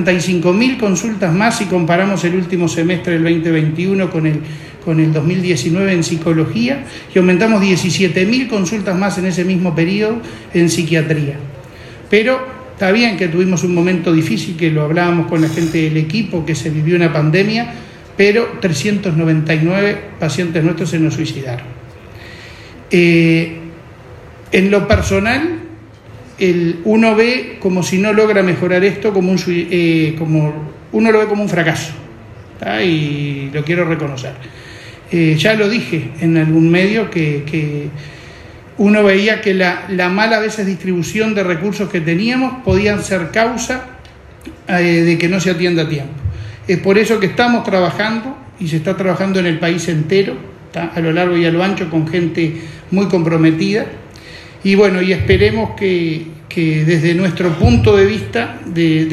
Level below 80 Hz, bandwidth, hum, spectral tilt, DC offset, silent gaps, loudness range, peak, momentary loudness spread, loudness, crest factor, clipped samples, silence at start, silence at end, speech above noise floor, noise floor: -38 dBFS; 13 kHz; none; -6 dB/octave; under 0.1%; none; 3 LU; 0 dBFS; 13 LU; -14 LUFS; 14 dB; under 0.1%; 0 s; 0 s; 24 dB; -37 dBFS